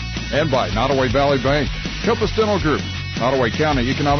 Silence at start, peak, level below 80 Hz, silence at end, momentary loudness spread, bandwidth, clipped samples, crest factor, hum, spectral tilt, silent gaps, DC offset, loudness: 0 s; -8 dBFS; -32 dBFS; 0 s; 5 LU; 6.6 kHz; under 0.1%; 10 dB; none; -5.5 dB/octave; none; under 0.1%; -19 LUFS